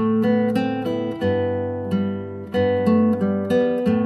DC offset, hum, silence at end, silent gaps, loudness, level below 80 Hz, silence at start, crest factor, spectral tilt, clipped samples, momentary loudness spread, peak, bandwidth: under 0.1%; none; 0 s; none; -21 LUFS; -58 dBFS; 0 s; 12 dB; -8.5 dB/octave; under 0.1%; 7 LU; -8 dBFS; 12 kHz